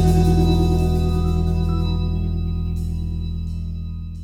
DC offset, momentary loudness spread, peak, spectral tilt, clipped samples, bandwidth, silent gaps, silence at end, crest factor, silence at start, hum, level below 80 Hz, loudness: under 0.1%; 12 LU; -6 dBFS; -8 dB/octave; under 0.1%; 14 kHz; none; 0 s; 14 dB; 0 s; none; -24 dBFS; -21 LUFS